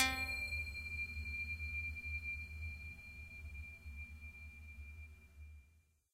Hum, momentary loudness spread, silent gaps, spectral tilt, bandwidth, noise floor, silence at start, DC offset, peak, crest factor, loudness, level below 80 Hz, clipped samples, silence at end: none; 17 LU; none; -3 dB/octave; 16 kHz; -71 dBFS; 0 s; under 0.1%; -20 dBFS; 24 dB; -44 LUFS; -52 dBFS; under 0.1%; 0.35 s